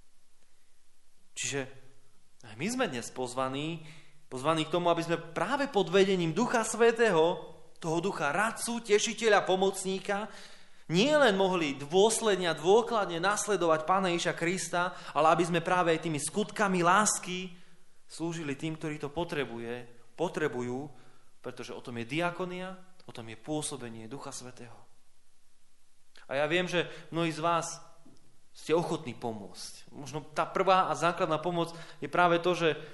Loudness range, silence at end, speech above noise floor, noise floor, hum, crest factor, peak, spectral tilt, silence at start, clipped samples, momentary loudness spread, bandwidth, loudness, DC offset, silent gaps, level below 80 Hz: 10 LU; 0 s; 20 dB; -50 dBFS; none; 22 dB; -10 dBFS; -4 dB/octave; 0.05 s; under 0.1%; 18 LU; 11.5 kHz; -29 LUFS; under 0.1%; none; -64 dBFS